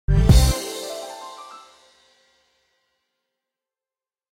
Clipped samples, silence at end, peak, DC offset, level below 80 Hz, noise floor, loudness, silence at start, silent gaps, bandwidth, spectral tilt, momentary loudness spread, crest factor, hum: under 0.1%; 2.75 s; -2 dBFS; under 0.1%; -26 dBFS; under -90 dBFS; -20 LUFS; 0.1 s; none; 16 kHz; -5.5 dB/octave; 23 LU; 22 dB; none